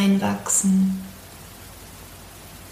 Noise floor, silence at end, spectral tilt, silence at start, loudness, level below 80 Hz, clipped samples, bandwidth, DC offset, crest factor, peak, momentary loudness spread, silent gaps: -42 dBFS; 0 s; -4.5 dB/octave; 0 s; -21 LUFS; -50 dBFS; under 0.1%; 15.5 kHz; under 0.1%; 16 dB; -8 dBFS; 22 LU; none